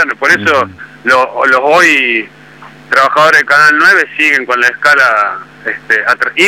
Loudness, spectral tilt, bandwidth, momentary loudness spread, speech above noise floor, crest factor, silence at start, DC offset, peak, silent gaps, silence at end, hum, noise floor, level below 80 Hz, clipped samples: -8 LUFS; -2.5 dB/octave; 17 kHz; 11 LU; 25 dB; 10 dB; 0 s; 0.1%; 0 dBFS; none; 0 s; none; -35 dBFS; -56 dBFS; under 0.1%